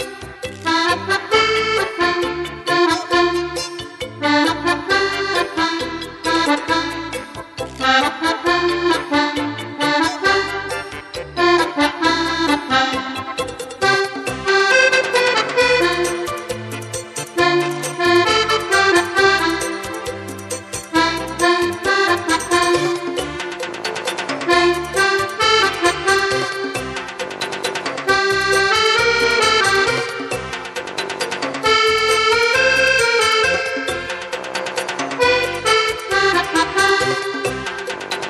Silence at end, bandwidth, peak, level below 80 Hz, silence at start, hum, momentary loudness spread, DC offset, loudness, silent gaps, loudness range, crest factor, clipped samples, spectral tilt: 0 s; 14 kHz; 0 dBFS; -46 dBFS; 0 s; none; 12 LU; under 0.1%; -17 LUFS; none; 3 LU; 18 dB; under 0.1%; -2.5 dB/octave